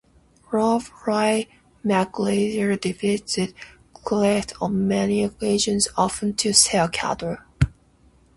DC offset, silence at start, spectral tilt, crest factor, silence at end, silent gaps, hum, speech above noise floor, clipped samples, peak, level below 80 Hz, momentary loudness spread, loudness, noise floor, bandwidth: under 0.1%; 0.5 s; -4 dB/octave; 20 dB; 0.7 s; none; none; 35 dB; under 0.1%; -2 dBFS; -44 dBFS; 8 LU; -22 LUFS; -56 dBFS; 11.5 kHz